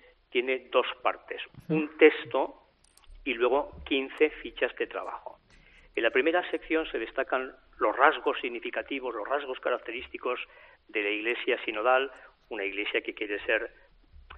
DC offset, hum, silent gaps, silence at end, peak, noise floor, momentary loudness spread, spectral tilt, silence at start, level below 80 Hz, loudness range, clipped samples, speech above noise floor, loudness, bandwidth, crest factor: under 0.1%; none; none; 0 s; -4 dBFS; -58 dBFS; 14 LU; -1.5 dB/octave; 0.3 s; -60 dBFS; 3 LU; under 0.1%; 29 dB; -29 LUFS; 4.9 kHz; 26 dB